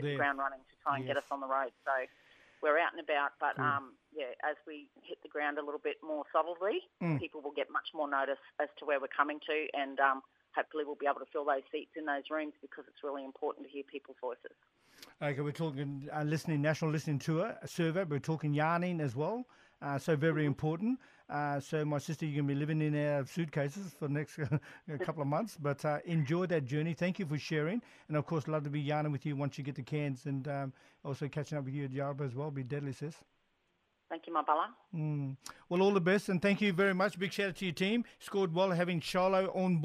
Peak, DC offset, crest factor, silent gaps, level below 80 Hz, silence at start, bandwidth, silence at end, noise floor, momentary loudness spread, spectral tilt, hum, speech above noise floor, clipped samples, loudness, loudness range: -14 dBFS; under 0.1%; 22 dB; none; -74 dBFS; 0 s; 13.5 kHz; 0 s; -78 dBFS; 11 LU; -6.5 dB/octave; none; 43 dB; under 0.1%; -35 LUFS; 7 LU